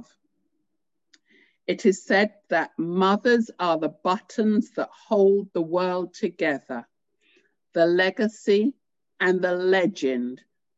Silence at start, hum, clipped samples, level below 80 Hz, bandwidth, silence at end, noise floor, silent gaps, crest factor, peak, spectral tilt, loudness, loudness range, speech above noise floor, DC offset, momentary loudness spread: 1.7 s; none; under 0.1%; -76 dBFS; 8 kHz; 0.4 s; -82 dBFS; none; 16 dB; -8 dBFS; -5.5 dB/octave; -24 LUFS; 2 LU; 59 dB; under 0.1%; 11 LU